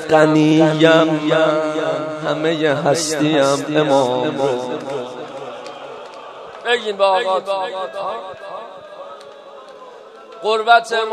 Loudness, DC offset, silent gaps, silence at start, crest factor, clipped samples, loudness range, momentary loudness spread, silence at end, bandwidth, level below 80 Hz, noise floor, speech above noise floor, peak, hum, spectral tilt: -17 LUFS; under 0.1%; none; 0 s; 18 dB; under 0.1%; 7 LU; 22 LU; 0 s; 13 kHz; -64 dBFS; -39 dBFS; 23 dB; 0 dBFS; none; -5 dB/octave